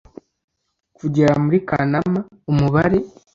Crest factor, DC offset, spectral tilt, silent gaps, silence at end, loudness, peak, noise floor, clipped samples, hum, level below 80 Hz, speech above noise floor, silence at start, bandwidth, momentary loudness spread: 16 dB; under 0.1%; -8.5 dB/octave; none; 0.25 s; -19 LUFS; -2 dBFS; -62 dBFS; under 0.1%; none; -44 dBFS; 45 dB; 1.05 s; 7.6 kHz; 7 LU